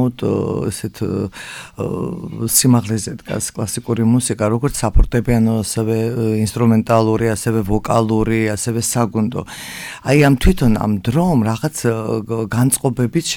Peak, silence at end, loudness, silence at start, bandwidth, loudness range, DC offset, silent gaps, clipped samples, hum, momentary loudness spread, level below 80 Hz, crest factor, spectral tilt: -2 dBFS; 0 s; -17 LUFS; 0 s; 19 kHz; 2 LU; under 0.1%; none; under 0.1%; none; 11 LU; -28 dBFS; 16 dB; -5.5 dB/octave